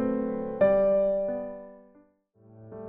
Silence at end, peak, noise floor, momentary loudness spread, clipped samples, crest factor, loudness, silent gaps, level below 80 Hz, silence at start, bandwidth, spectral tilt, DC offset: 0 s; -12 dBFS; -61 dBFS; 19 LU; under 0.1%; 16 dB; -26 LUFS; none; -56 dBFS; 0 s; 3.8 kHz; -8 dB/octave; under 0.1%